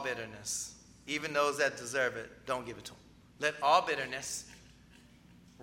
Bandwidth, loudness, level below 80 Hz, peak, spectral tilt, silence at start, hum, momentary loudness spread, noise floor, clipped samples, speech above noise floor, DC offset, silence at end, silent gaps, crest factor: 16.5 kHz; -33 LUFS; -66 dBFS; -12 dBFS; -2 dB/octave; 0 s; none; 17 LU; -59 dBFS; under 0.1%; 25 dB; under 0.1%; 0 s; none; 24 dB